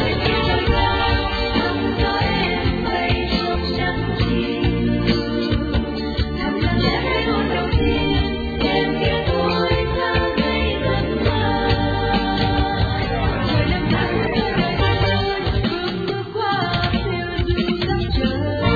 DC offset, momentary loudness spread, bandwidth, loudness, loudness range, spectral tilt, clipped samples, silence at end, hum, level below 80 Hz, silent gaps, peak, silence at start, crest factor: under 0.1%; 3 LU; 5 kHz; -20 LUFS; 1 LU; -8 dB/octave; under 0.1%; 0 s; none; -28 dBFS; none; -4 dBFS; 0 s; 16 dB